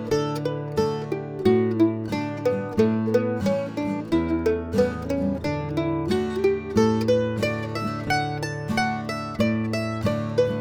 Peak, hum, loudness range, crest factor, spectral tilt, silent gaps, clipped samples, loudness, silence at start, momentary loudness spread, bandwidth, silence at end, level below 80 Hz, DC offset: -6 dBFS; none; 1 LU; 18 dB; -6.5 dB/octave; none; under 0.1%; -24 LUFS; 0 s; 7 LU; 18.5 kHz; 0 s; -46 dBFS; under 0.1%